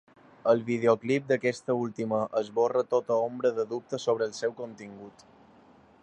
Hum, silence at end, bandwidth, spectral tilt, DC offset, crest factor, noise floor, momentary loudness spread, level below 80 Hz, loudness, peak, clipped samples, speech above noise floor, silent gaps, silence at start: none; 0.95 s; 9.6 kHz; -6 dB/octave; under 0.1%; 20 dB; -57 dBFS; 9 LU; -74 dBFS; -28 LUFS; -10 dBFS; under 0.1%; 29 dB; none; 0.45 s